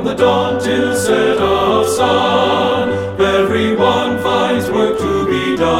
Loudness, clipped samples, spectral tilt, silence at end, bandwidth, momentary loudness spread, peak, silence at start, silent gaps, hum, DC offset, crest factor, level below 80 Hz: -14 LUFS; under 0.1%; -4.5 dB/octave; 0 s; 16 kHz; 3 LU; 0 dBFS; 0 s; none; none; under 0.1%; 14 dB; -40 dBFS